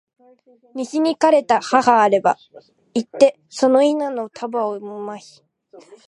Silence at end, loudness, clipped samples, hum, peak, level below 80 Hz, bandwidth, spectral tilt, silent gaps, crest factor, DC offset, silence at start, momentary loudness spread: 0.1 s; -18 LUFS; under 0.1%; none; 0 dBFS; -70 dBFS; 11 kHz; -4.5 dB/octave; none; 18 dB; under 0.1%; 0.75 s; 16 LU